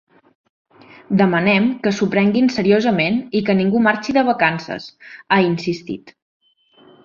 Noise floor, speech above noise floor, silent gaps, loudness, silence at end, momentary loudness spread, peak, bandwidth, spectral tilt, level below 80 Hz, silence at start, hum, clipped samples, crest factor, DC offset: -52 dBFS; 35 dB; none; -17 LUFS; 0.95 s; 12 LU; -2 dBFS; 7.2 kHz; -6.5 dB/octave; -58 dBFS; 1.1 s; none; under 0.1%; 16 dB; under 0.1%